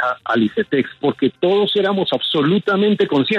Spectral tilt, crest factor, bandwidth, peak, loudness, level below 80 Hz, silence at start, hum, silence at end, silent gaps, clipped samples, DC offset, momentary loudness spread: -7 dB/octave; 12 dB; 7 kHz; -6 dBFS; -17 LUFS; -64 dBFS; 0 s; none; 0 s; none; under 0.1%; under 0.1%; 3 LU